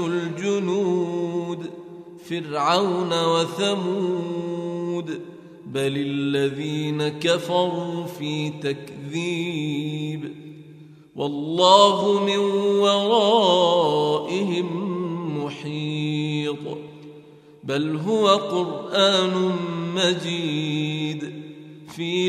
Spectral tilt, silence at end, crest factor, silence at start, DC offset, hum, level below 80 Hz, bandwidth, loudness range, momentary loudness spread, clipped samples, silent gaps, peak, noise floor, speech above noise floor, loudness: -5 dB/octave; 0 s; 22 dB; 0 s; under 0.1%; none; -70 dBFS; 14 kHz; 9 LU; 15 LU; under 0.1%; none; 0 dBFS; -47 dBFS; 25 dB; -22 LUFS